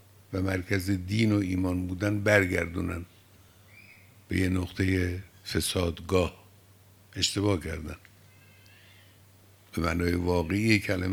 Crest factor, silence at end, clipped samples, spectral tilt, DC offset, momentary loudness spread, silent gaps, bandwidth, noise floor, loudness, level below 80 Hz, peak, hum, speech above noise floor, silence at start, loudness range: 22 dB; 0 s; under 0.1%; -5.5 dB/octave; under 0.1%; 13 LU; none; 20 kHz; -57 dBFS; -28 LUFS; -54 dBFS; -6 dBFS; none; 29 dB; 0.3 s; 5 LU